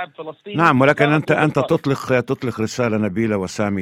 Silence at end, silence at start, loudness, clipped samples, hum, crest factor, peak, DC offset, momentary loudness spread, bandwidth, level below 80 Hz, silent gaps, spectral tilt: 0 s; 0 s; -18 LUFS; under 0.1%; none; 18 dB; 0 dBFS; under 0.1%; 9 LU; 15.5 kHz; -54 dBFS; none; -6.5 dB/octave